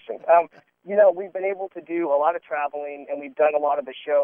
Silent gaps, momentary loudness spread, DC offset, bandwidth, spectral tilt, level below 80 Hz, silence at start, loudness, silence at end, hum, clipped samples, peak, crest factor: none; 14 LU; under 0.1%; 3.6 kHz; -8 dB/octave; -82 dBFS; 0.1 s; -23 LUFS; 0 s; none; under 0.1%; -6 dBFS; 18 dB